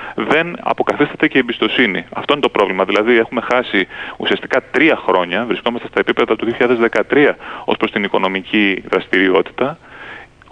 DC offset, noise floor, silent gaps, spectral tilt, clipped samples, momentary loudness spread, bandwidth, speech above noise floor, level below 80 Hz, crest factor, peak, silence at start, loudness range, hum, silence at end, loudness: under 0.1%; -35 dBFS; none; -6 dB/octave; under 0.1%; 8 LU; 9.4 kHz; 20 dB; -52 dBFS; 16 dB; 0 dBFS; 0 s; 1 LU; none; 0.25 s; -15 LUFS